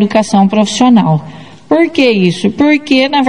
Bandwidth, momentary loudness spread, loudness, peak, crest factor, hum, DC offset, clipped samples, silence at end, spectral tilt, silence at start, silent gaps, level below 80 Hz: 10.5 kHz; 5 LU; -10 LUFS; 0 dBFS; 10 dB; none; 0.9%; 0.5%; 0 s; -5.5 dB/octave; 0 s; none; -50 dBFS